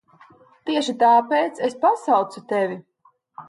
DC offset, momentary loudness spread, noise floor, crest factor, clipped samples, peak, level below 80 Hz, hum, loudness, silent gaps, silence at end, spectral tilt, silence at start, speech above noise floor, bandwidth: under 0.1%; 10 LU; -60 dBFS; 16 dB; under 0.1%; -6 dBFS; -76 dBFS; none; -20 LUFS; none; 0.05 s; -4.5 dB/octave; 0.65 s; 41 dB; 11.5 kHz